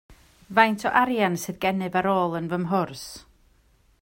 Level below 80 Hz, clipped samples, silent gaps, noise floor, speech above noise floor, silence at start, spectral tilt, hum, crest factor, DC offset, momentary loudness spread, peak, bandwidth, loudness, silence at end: -58 dBFS; under 0.1%; none; -61 dBFS; 37 dB; 0.1 s; -5 dB/octave; none; 22 dB; under 0.1%; 13 LU; -2 dBFS; 16.5 kHz; -24 LUFS; 0.8 s